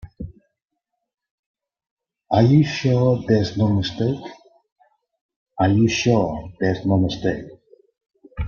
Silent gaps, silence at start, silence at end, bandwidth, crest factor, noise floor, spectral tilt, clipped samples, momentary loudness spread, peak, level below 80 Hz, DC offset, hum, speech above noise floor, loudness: 1.31-1.54 s, 1.91-1.97 s, 4.72-4.76 s, 5.21-5.29 s, 5.36-5.46 s; 0.05 s; 0 s; 7.2 kHz; 20 dB; -79 dBFS; -7 dB/octave; under 0.1%; 17 LU; -2 dBFS; -46 dBFS; under 0.1%; none; 61 dB; -20 LUFS